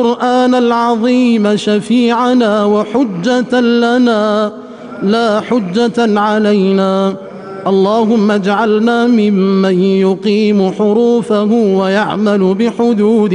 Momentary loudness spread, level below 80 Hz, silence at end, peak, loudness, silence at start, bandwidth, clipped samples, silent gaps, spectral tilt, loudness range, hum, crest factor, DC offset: 4 LU; -54 dBFS; 0 s; -2 dBFS; -12 LUFS; 0 s; 10.5 kHz; under 0.1%; none; -6.5 dB/octave; 2 LU; none; 8 dB; under 0.1%